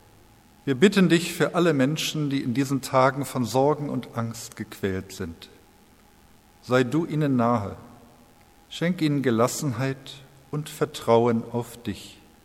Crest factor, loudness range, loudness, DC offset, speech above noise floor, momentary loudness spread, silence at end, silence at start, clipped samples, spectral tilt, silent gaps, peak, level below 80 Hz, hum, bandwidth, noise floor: 20 dB; 7 LU; -24 LUFS; under 0.1%; 31 dB; 16 LU; 0.3 s; 0.65 s; under 0.1%; -5.5 dB/octave; none; -4 dBFS; -60 dBFS; none; 16.5 kHz; -55 dBFS